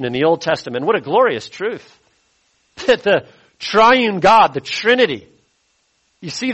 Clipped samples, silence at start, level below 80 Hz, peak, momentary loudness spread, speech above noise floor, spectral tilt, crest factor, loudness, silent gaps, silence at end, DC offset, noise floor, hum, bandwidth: under 0.1%; 0 s; -54 dBFS; -2 dBFS; 15 LU; 48 dB; -4.5 dB/octave; 16 dB; -15 LUFS; none; 0 s; under 0.1%; -63 dBFS; none; 8.4 kHz